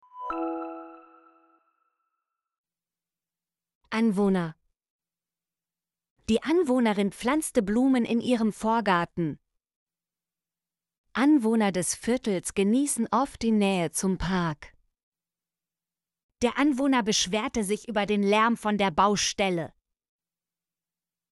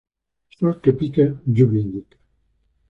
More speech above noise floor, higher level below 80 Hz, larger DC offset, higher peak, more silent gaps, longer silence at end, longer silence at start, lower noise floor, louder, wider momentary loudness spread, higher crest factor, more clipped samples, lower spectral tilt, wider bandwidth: first, over 65 dB vs 47 dB; about the same, -54 dBFS vs -52 dBFS; neither; second, -10 dBFS vs -2 dBFS; first, 2.58-2.64 s, 3.75-3.81 s, 4.90-4.99 s, 6.10-6.16 s, 9.76-9.87 s, 10.98-11.04 s, 15.03-15.12 s, 16.23-16.29 s vs none; first, 1.65 s vs 0.9 s; second, 0.15 s vs 0.6 s; first, under -90 dBFS vs -65 dBFS; second, -26 LUFS vs -19 LUFS; about the same, 10 LU vs 9 LU; about the same, 18 dB vs 18 dB; neither; second, -4.5 dB/octave vs -11 dB/octave; first, 11.5 kHz vs 4.3 kHz